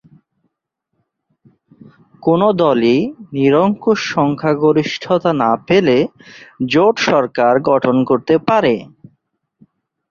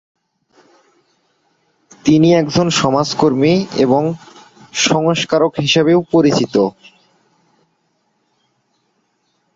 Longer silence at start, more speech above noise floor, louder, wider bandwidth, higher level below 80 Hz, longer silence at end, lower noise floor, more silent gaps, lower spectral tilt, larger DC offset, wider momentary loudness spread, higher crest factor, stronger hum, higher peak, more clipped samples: first, 2.25 s vs 2.05 s; first, 60 dB vs 51 dB; about the same, -15 LUFS vs -14 LUFS; about the same, 7.2 kHz vs 7.8 kHz; about the same, -56 dBFS vs -52 dBFS; second, 1.25 s vs 2.85 s; first, -74 dBFS vs -64 dBFS; neither; first, -6.5 dB/octave vs -5 dB/octave; neither; about the same, 5 LU vs 6 LU; about the same, 14 dB vs 16 dB; neither; about the same, -2 dBFS vs -2 dBFS; neither